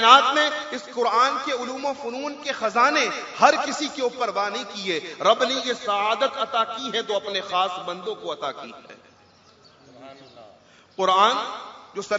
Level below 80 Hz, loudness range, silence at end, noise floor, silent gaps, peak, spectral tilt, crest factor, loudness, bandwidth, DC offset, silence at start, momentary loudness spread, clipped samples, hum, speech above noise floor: -76 dBFS; 8 LU; 0 s; -54 dBFS; none; 0 dBFS; -2 dB/octave; 24 dB; -23 LUFS; 7.8 kHz; under 0.1%; 0 s; 12 LU; under 0.1%; none; 32 dB